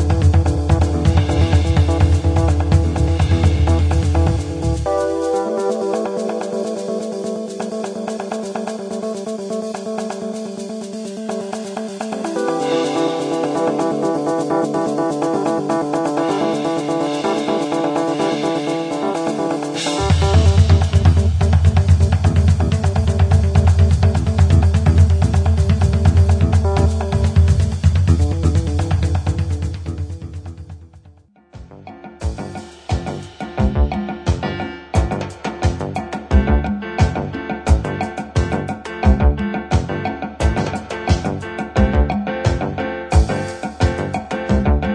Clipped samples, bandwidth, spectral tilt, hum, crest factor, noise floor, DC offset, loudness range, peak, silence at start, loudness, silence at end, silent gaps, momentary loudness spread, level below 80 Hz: under 0.1%; 10.5 kHz; -7 dB/octave; none; 16 dB; -47 dBFS; under 0.1%; 10 LU; -2 dBFS; 0 s; -18 LUFS; 0 s; none; 11 LU; -24 dBFS